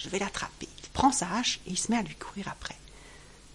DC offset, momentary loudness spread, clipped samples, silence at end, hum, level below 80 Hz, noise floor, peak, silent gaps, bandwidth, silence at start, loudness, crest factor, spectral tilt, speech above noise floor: under 0.1%; 22 LU; under 0.1%; 0 s; none; -52 dBFS; -51 dBFS; -10 dBFS; none; 11.5 kHz; 0 s; -30 LUFS; 22 dB; -3 dB/octave; 20 dB